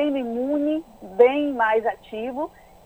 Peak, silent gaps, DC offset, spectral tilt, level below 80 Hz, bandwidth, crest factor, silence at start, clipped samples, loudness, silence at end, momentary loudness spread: -4 dBFS; none; under 0.1%; -6 dB/octave; -58 dBFS; 12.5 kHz; 20 dB; 0 s; under 0.1%; -23 LUFS; 0.4 s; 14 LU